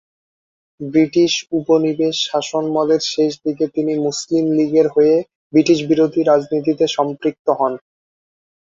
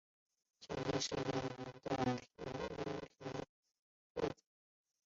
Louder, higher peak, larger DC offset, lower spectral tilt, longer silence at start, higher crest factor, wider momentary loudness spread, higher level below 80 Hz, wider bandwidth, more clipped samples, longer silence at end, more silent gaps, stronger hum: first, -17 LUFS vs -43 LUFS; first, -2 dBFS vs -26 dBFS; neither; about the same, -5 dB/octave vs -4.5 dB/octave; first, 0.8 s vs 0.6 s; about the same, 16 dB vs 18 dB; second, 6 LU vs 11 LU; first, -60 dBFS vs -66 dBFS; about the same, 7.8 kHz vs 7.6 kHz; neither; first, 0.9 s vs 0.7 s; second, 5.35-5.50 s, 7.39-7.45 s vs 3.49-3.63 s, 3.79-4.15 s; neither